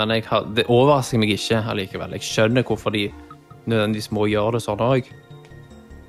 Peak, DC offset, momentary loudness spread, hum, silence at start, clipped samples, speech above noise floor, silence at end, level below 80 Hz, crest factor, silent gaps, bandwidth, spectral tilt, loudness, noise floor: -4 dBFS; under 0.1%; 10 LU; none; 0 s; under 0.1%; 23 dB; 0.05 s; -48 dBFS; 16 dB; none; 15.5 kHz; -5.5 dB/octave; -21 LUFS; -43 dBFS